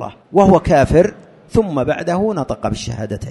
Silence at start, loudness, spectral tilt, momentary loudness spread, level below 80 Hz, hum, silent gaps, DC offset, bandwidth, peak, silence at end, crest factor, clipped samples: 0 s; -16 LUFS; -7 dB/octave; 11 LU; -34 dBFS; none; none; under 0.1%; 11.5 kHz; 0 dBFS; 0 s; 16 dB; under 0.1%